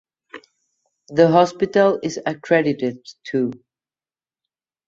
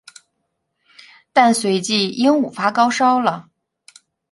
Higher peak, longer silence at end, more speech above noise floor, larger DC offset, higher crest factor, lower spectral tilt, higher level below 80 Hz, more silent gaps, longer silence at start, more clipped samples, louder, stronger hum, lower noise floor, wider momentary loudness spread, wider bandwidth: about the same, -2 dBFS vs -2 dBFS; first, 1.3 s vs 0.9 s; first, over 72 dB vs 57 dB; neither; about the same, 20 dB vs 18 dB; first, -6 dB/octave vs -4 dB/octave; first, -62 dBFS vs -68 dBFS; neither; second, 0.35 s vs 1.35 s; neither; about the same, -19 LUFS vs -17 LUFS; neither; first, under -90 dBFS vs -73 dBFS; first, 12 LU vs 5 LU; second, 7.6 kHz vs 11.5 kHz